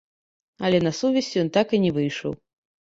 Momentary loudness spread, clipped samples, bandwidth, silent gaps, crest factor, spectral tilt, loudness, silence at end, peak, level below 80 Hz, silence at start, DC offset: 10 LU; under 0.1%; 8 kHz; none; 18 dB; -6 dB/octave; -23 LUFS; 0.6 s; -6 dBFS; -60 dBFS; 0.6 s; under 0.1%